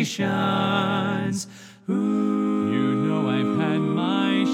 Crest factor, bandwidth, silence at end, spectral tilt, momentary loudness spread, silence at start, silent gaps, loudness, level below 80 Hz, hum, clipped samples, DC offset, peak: 16 dB; 14 kHz; 0 s; -6 dB/octave; 6 LU; 0 s; none; -23 LUFS; -72 dBFS; none; under 0.1%; under 0.1%; -6 dBFS